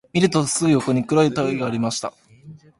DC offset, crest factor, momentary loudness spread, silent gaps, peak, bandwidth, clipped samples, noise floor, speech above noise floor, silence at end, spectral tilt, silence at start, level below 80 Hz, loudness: under 0.1%; 18 dB; 7 LU; none; -4 dBFS; 11.5 kHz; under 0.1%; -44 dBFS; 25 dB; 0.25 s; -5 dB/octave; 0.15 s; -56 dBFS; -20 LUFS